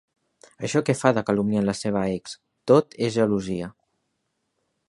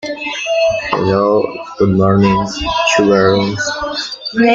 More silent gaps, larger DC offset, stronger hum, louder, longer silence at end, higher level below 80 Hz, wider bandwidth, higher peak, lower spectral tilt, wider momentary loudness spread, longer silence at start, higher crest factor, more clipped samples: neither; neither; neither; second, -23 LUFS vs -14 LUFS; first, 1.2 s vs 0 s; second, -58 dBFS vs -40 dBFS; first, 11.5 kHz vs 7.8 kHz; about the same, -2 dBFS vs -2 dBFS; about the same, -6 dB/octave vs -5 dB/octave; first, 14 LU vs 9 LU; first, 0.6 s vs 0 s; first, 22 dB vs 12 dB; neither